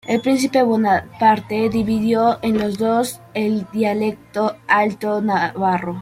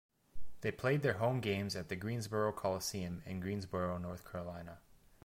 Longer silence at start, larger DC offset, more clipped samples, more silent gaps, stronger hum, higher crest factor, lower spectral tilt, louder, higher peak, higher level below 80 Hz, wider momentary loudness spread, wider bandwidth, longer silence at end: about the same, 0.05 s vs 0.1 s; neither; neither; neither; neither; about the same, 16 dB vs 20 dB; about the same, -5.5 dB/octave vs -5.5 dB/octave; first, -19 LUFS vs -38 LUFS; first, -2 dBFS vs -18 dBFS; first, -52 dBFS vs -62 dBFS; second, 6 LU vs 11 LU; about the same, 16 kHz vs 16.5 kHz; about the same, 0 s vs 0 s